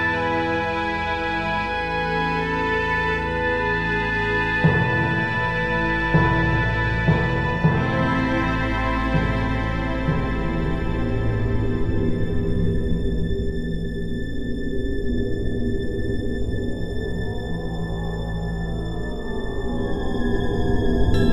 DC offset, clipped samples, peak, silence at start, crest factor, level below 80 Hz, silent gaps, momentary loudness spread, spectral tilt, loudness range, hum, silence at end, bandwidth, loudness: 0.6%; under 0.1%; -4 dBFS; 0 s; 16 dB; -30 dBFS; none; 8 LU; -7.5 dB/octave; 7 LU; none; 0 s; 9.4 kHz; -23 LUFS